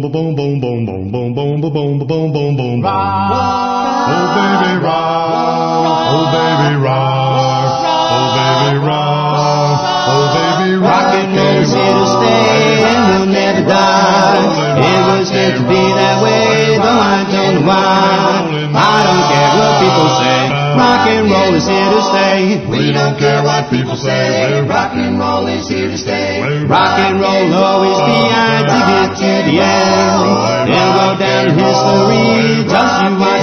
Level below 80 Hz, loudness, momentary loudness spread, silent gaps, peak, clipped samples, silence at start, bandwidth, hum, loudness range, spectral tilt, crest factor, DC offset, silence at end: -46 dBFS; -11 LUFS; 6 LU; none; 0 dBFS; under 0.1%; 0 s; 6.6 kHz; none; 4 LU; -5.5 dB/octave; 10 dB; under 0.1%; 0 s